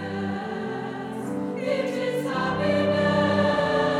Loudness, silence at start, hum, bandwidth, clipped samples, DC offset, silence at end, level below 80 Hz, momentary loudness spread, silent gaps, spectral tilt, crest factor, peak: -25 LUFS; 0 s; none; 14.5 kHz; under 0.1%; under 0.1%; 0 s; -58 dBFS; 10 LU; none; -6.5 dB/octave; 14 dB; -10 dBFS